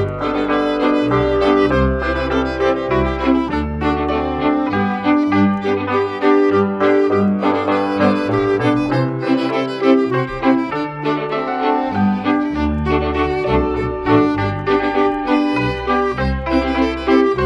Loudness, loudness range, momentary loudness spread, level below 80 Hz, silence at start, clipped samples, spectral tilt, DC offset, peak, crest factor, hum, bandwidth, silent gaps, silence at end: -17 LUFS; 2 LU; 5 LU; -32 dBFS; 0 s; under 0.1%; -7.5 dB/octave; under 0.1%; 0 dBFS; 16 dB; none; 8 kHz; none; 0 s